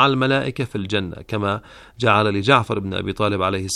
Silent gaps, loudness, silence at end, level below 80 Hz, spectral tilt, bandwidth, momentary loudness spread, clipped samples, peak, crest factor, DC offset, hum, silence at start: none; -20 LUFS; 0 s; -50 dBFS; -5 dB/octave; 12 kHz; 9 LU; under 0.1%; 0 dBFS; 20 dB; under 0.1%; none; 0 s